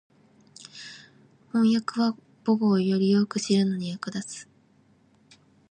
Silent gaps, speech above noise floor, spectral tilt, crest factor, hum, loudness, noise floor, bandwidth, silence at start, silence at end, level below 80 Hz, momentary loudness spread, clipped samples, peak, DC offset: none; 37 dB; -6 dB/octave; 16 dB; none; -25 LUFS; -61 dBFS; 9.6 kHz; 0.6 s; 1.3 s; -74 dBFS; 20 LU; under 0.1%; -10 dBFS; under 0.1%